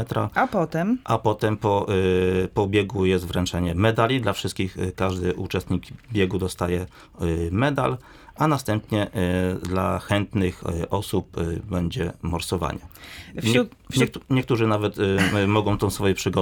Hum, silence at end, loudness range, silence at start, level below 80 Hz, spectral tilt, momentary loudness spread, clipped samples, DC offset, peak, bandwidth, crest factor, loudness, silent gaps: none; 0 s; 4 LU; 0 s; -46 dBFS; -6 dB/octave; 7 LU; under 0.1%; under 0.1%; -4 dBFS; 19.5 kHz; 20 dB; -24 LUFS; none